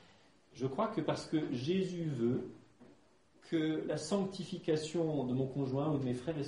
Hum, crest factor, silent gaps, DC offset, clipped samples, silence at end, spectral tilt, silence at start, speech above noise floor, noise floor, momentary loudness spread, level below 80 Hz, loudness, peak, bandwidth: none; 18 dB; none; under 0.1%; under 0.1%; 0 s; -6.5 dB/octave; 0.55 s; 32 dB; -67 dBFS; 5 LU; -70 dBFS; -36 LUFS; -20 dBFS; 11 kHz